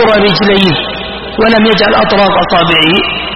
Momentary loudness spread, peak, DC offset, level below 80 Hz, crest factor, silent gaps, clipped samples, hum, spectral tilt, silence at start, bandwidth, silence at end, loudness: 8 LU; 0 dBFS; under 0.1%; -32 dBFS; 8 dB; none; 0.2%; none; -6.5 dB/octave; 0 s; 10 kHz; 0 s; -8 LUFS